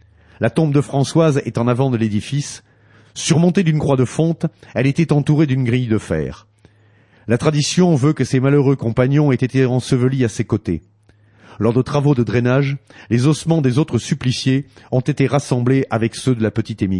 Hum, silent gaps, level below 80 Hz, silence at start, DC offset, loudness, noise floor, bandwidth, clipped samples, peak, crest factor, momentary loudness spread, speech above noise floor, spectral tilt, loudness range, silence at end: none; none; -48 dBFS; 0.4 s; under 0.1%; -17 LUFS; -52 dBFS; 11.5 kHz; under 0.1%; -2 dBFS; 14 dB; 8 LU; 36 dB; -6.5 dB/octave; 3 LU; 0 s